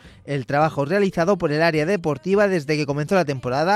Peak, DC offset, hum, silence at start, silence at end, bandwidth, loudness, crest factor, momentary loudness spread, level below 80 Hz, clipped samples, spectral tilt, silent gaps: -6 dBFS; under 0.1%; none; 0.05 s; 0 s; 13 kHz; -21 LUFS; 14 dB; 4 LU; -52 dBFS; under 0.1%; -6.5 dB/octave; none